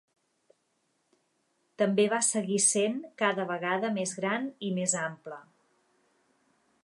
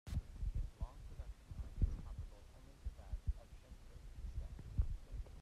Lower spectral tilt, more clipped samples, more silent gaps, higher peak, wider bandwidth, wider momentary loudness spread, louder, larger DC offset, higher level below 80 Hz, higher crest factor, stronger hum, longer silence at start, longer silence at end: second, -3.5 dB/octave vs -7 dB/octave; neither; neither; first, -12 dBFS vs -24 dBFS; about the same, 11.5 kHz vs 12 kHz; second, 10 LU vs 16 LU; first, -28 LUFS vs -48 LUFS; neither; second, -84 dBFS vs -46 dBFS; about the same, 20 dB vs 22 dB; neither; first, 1.8 s vs 0.05 s; first, 1.4 s vs 0 s